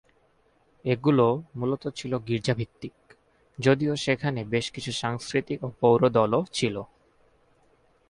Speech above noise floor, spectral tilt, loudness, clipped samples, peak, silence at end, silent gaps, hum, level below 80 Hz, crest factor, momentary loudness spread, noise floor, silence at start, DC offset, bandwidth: 39 dB; -6 dB/octave; -26 LUFS; under 0.1%; -8 dBFS; 1.25 s; none; none; -60 dBFS; 20 dB; 14 LU; -65 dBFS; 0.85 s; under 0.1%; 11.5 kHz